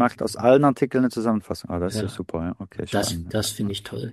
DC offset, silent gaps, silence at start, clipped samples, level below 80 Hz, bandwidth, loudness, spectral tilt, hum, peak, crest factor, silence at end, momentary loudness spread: under 0.1%; none; 0 s; under 0.1%; -50 dBFS; 15 kHz; -24 LUFS; -5.5 dB/octave; none; -4 dBFS; 20 dB; 0 s; 12 LU